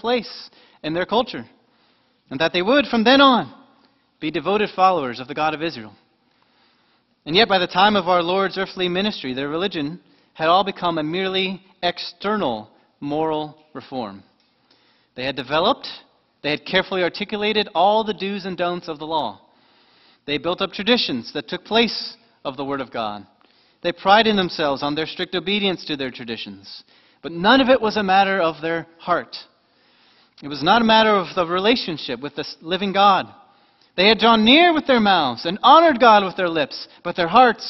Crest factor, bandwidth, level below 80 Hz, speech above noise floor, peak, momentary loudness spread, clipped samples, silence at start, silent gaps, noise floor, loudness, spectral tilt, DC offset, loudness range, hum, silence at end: 20 dB; 6.2 kHz; -56 dBFS; 43 dB; 0 dBFS; 17 LU; under 0.1%; 0.05 s; none; -62 dBFS; -19 LUFS; -6 dB/octave; under 0.1%; 9 LU; none; 0 s